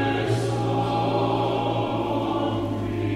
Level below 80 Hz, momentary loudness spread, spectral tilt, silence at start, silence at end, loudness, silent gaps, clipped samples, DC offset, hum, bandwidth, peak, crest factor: -48 dBFS; 3 LU; -7 dB/octave; 0 s; 0 s; -24 LUFS; none; under 0.1%; under 0.1%; none; 12 kHz; -12 dBFS; 12 dB